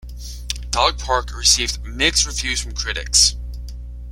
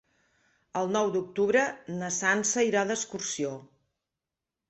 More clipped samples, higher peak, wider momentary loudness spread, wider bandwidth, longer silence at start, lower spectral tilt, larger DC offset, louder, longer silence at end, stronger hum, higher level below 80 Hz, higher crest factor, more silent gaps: neither; first, 0 dBFS vs -10 dBFS; first, 20 LU vs 10 LU; first, 16.5 kHz vs 8.4 kHz; second, 0 s vs 0.75 s; second, -1 dB/octave vs -3 dB/octave; neither; first, -18 LUFS vs -28 LUFS; second, 0 s vs 1.05 s; first, 60 Hz at -30 dBFS vs none; first, -30 dBFS vs -72 dBFS; about the same, 20 dB vs 20 dB; neither